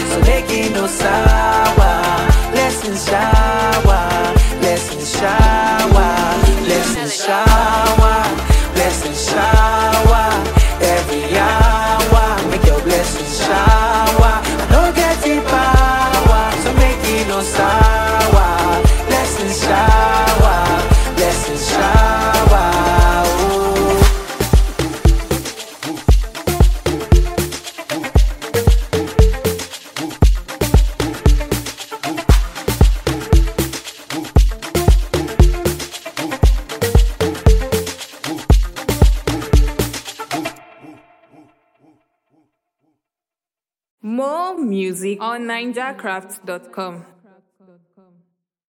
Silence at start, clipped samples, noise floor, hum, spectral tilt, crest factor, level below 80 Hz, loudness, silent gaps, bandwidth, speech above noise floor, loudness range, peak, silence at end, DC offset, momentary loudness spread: 0 s; under 0.1%; under -90 dBFS; none; -5 dB/octave; 14 dB; -18 dBFS; -15 LUFS; 43.91-43.98 s; 16.5 kHz; over 69 dB; 10 LU; 0 dBFS; 1.65 s; under 0.1%; 11 LU